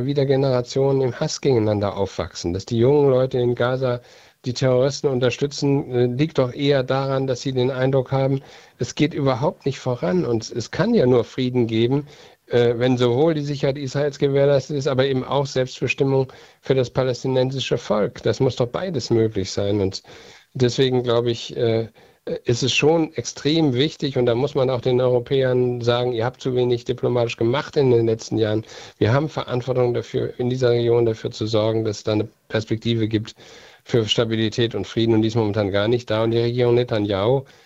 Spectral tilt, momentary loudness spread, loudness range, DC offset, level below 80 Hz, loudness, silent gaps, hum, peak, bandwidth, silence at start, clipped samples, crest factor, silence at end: -6 dB/octave; 7 LU; 2 LU; under 0.1%; -52 dBFS; -21 LUFS; none; none; -4 dBFS; 8 kHz; 0 s; under 0.1%; 18 dB; 0.2 s